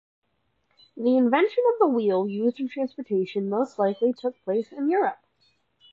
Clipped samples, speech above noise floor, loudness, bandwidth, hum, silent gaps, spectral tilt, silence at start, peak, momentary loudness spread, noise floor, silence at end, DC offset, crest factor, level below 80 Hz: under 0.1%; 49 dB; -24 LUFS; 7.4 kHz; none; none; -8 dB/octave; 0.95 s; -8 dBFS; 8 LU; -72 dBFS; 0.8 s; under 0.1%; 18 dB; -80 dBFS